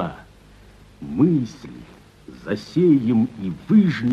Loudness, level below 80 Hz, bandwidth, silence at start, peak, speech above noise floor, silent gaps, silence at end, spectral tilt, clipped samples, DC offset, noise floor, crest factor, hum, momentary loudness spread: -20 LUFS; -52 dBFS; 7.6 kHz; 0 s; -6 dBFS; 29 dB; none; 0 s; -8.5 dB/octave; under 0.1%; under 0.1%; -48 dBFS; 16 dB; 50 Hz at -50 dBFS; 22 LU